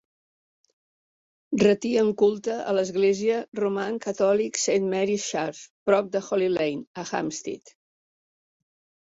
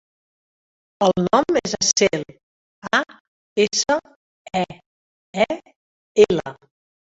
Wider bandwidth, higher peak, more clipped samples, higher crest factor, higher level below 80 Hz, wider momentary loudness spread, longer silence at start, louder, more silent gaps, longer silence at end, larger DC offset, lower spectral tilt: about the same, 8 kHz vs 8 kHz; second, -6 dBFS vs -2 dBFS; neither; about the same, 20 dB vs 22 dB; second, -66 dBFS vs -56 dBFS; second, 10 LU vs 15 LU; first, 1.5 s vs 1 s; second, -25 LUFS vs -20 LUFS; second, 3.48-3.52 s, 5.70-5.86 s, 6.87-6.95 s vs 2.43-2.82 s, 3.20-3.56 s, 4.16-4.45 s, 4.86-5.33 s, 5.76-6.15 s; first, 1.45 s vs 0.5 s; neither; first, -4.5 dB/octave vs -3 dB/octave